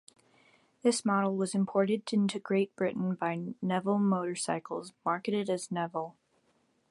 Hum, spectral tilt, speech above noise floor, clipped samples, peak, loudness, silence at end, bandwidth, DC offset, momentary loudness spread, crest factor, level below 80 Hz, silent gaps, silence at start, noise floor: none; -5.5 dB/octave; 41 dB; under 0.1%; -14 dBFS; -31 LUFS; 0.8 s; 11.5 kHz; under 0.1%; 7 LU; 18 dB; -76 dBFS; none; 0.85 s; -72 dBFS